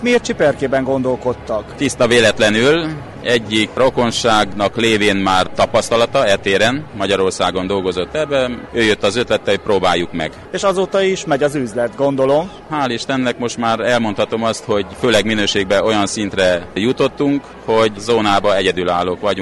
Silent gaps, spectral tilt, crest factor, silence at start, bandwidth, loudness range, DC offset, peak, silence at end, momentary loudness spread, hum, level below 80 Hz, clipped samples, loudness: none; -4 dB/octave; 14 dB; 0 s; 11.5 kHz; 3 LU; under 0.1%; -2 dBFS; 0 s; 6 LU; none; -44 dBFS; under 0.1%; -16 LUFS